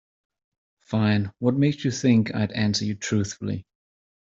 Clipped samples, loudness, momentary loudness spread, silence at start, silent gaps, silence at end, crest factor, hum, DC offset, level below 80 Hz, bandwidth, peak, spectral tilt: under 0.1%; -24 LUFS; 9 LU; 0.9 s; none; 0.7 s; 18 dB; none; under 0.1%; -60 dBFS; 7.8 kHz; -8 dBFS; -6 dB/octave